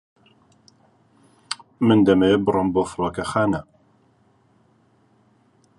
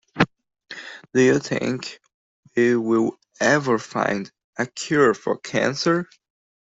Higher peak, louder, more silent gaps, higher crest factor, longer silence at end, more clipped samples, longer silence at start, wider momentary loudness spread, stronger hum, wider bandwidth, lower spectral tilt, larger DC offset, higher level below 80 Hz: about the same, -2 dBFS vs -2 dBFS; about the same, -20 LUFS vs -22 LUFS; second, none vs 2.14-2.43 s, 4.44-4.53 s; about the same, 20 dB vs 22 dB; first, 2.15 s vs 0.7 s; neither; first, 1.5 s vs 0.15 s; about the same, 16 LU vs 17 LU; neither; first, 11.5 kHz vs 8 kHz; first, -6.5 dB/octave vs -5 dB/octave; neither; first, -50 dBFS vs -60 dBFS